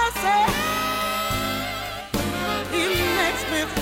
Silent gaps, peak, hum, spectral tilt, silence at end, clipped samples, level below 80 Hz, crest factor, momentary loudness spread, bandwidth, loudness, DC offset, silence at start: none; -8 dBFS; none; -3.5 dB/octave; 0 s; under 0.1%; -40 dBFS; 14 dB; 7 LU; 16.5 kHz; -23 LUFS; under 0.1%; 0 s